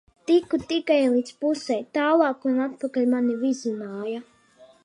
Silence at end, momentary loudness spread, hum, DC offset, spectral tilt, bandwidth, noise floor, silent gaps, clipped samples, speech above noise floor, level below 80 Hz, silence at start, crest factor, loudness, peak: 0.2 s; 11 LU; none; under 0.1%; -4.5 dB/octave; 10.5 kHz; -54 dBFS; none; under 0.1%; 31 dB; -66 dBFS; 0.3 s; 18 dB; -24 LUFS; -6 dBFS